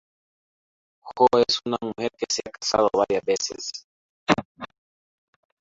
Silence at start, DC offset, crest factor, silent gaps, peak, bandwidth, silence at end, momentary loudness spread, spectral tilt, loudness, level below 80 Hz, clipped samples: 1.05 s; under 0.1%; 24 dB; 3.84-4.27 s, 4.45-4.55 s; -2 dBFS; 8 kHz; 0.95 s; 21 LU; -3 dB/octave; -24 LUFS; -60 dBFS; under 0.1%